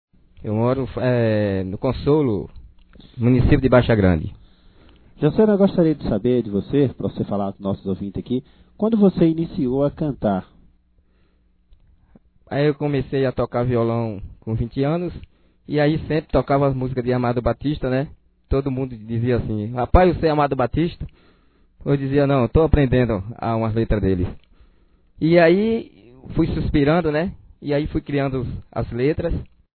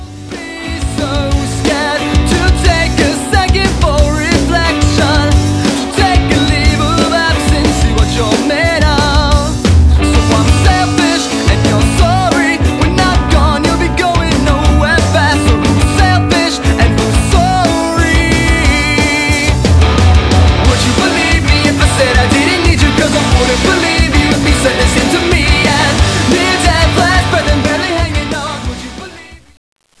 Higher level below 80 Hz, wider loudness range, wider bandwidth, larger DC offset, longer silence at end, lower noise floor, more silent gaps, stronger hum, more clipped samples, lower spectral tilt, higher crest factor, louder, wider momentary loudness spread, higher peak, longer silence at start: second, -34 dBFS vs -16 dBFS; about the same, 4 LU vs 2 LU; second, 4.5 kHz vs 11 kHz; second, under 0.1% vs 0.4%; second, 0.3 s vs 0.65 s; first, -60 dBFS vs -33 dBFS; neither; neither; second, under 0.1% vs 0.2%; first, -11.5 dB/octave vs -5 dB/octave; first, 20 dB vs 10 dB; second, -20 LUFS vs -10 LUFS; first, 11 LU vs 4 LU; about the same, 0 dBFS vs 0 dBFS; first, 0.4 s vs 0 s